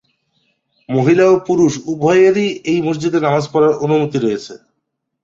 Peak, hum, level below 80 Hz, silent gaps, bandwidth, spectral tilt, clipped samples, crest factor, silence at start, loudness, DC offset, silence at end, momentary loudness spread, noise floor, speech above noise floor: -2 dBFS; none; -56 dBFS; none; 7.8 kHz; -6.5 dB/octave; under 0.1%; 14 dB; 0.9 s; -14 LUFS; under 0.1%; 0.65 s; 8 LU; -73 dBFS; 59 dB